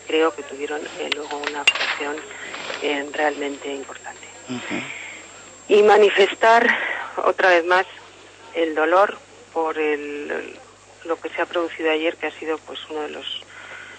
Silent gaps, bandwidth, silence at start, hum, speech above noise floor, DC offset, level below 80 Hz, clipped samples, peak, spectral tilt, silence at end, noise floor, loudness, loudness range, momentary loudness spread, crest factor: none; 9.6 kHz; 0 s; none; 23 dB; under 0.1%; -66 dBFS; under 0.1%; -2 dBFS; -2.5 dB/octave; 0 s; -44 dBFS; -21 LUFS; 9 LU; 20 LU; 20 dB